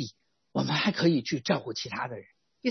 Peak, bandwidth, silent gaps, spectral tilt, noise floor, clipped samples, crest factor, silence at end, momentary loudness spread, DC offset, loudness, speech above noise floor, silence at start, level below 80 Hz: -12 dBFS; 6.4 kHz; none; -5.5 dB/octave; -49 dBFS; under 0.1%; 18 dB; 0 s; 13 LU; under 0.1%; -29 LUFS; 20 dB; 0 s; -70 dBFS